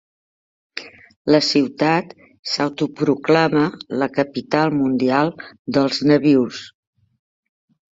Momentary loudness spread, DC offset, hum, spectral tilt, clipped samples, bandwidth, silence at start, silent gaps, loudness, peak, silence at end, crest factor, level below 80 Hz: 18 LU; under 0.1%; none; -6 dB/octave; under 0.1%; 7.8 kHz; 0.75 s; 1.16-1.25 s, 2.39-2.43 s, 5.59-5.65 s; -18 LUFS; -2 dBFS; 1.25 s; 18 dB; -60 dBFS